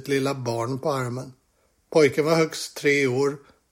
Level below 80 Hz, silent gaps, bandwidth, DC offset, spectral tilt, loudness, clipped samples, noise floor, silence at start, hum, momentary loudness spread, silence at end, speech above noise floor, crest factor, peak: -66 dBFS; none; 16.5 kHz; under 0.1%; -5 dB/octave; -23 LUFS; under 0.1%; -66 dBFS; 0 s; none; 12 LU; 0.35 s; 43 dB; 18 dB; -6 dBFS